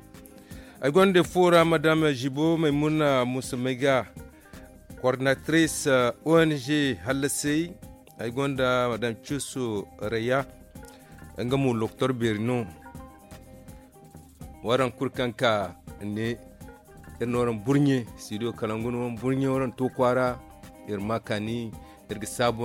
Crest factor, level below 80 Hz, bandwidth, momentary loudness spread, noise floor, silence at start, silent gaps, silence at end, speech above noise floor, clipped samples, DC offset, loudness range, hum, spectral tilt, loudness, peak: 18 dB; -54 dBFS; 16.5 kHz; 18 LU; -49 dBFS; 0.15 s; none; 0 s; 24 dB; under 0.1%; under 0.1%; 7 LU; none; -5.5 dB/octave; -26 LUFS; -8 dBFS